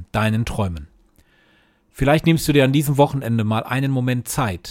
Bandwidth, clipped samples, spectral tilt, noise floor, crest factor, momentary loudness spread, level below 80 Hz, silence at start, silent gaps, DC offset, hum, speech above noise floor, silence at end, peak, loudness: 17 kHz; under 0.1%; -6 dB/octave; -58 dBFS; 18 dB; 8 LU; -40 dBFS; 0 s; none; under 0.1%; none; 39 dB; 0 s; -2 dBFS; -19 LUFS